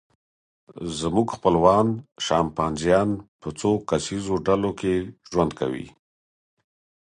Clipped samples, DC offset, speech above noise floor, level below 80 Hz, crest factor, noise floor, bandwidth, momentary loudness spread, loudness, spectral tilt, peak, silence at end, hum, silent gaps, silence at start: under 0.1%; under 0.1%; over 67 dB; -48 dBFS; 20 dB; under -90 dBFS; 11 kHz; 12 LU; -23 LUFS; -6 dB/octave; -4 dBFS; 1.25 s; none; 3.28-3.39 s; 0.75 s